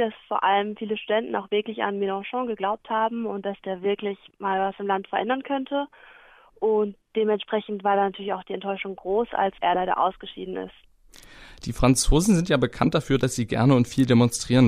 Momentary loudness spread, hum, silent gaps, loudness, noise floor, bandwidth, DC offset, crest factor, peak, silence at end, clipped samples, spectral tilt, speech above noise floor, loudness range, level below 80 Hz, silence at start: 11 LU; none; none; -24 LUFS; -49 dBFS; 15.5 kHz; under 0.1%; 20 dB; -4 dBFS; 0 s; under 0.1%; -5.5 dB/octave; 26 dB; 5 LU; -40 dBFS; 0 s